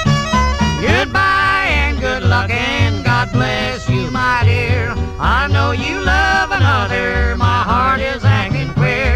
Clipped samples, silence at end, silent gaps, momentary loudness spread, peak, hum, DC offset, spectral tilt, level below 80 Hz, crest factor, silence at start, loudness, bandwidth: under 0.1%; 0 s; none; 4 LU; 0 dBFS; none; under 0.1%; -5.5 dB/octave; -24 dBFS; 14 dB; 0 s; -15 LUFS; 9.6 kHz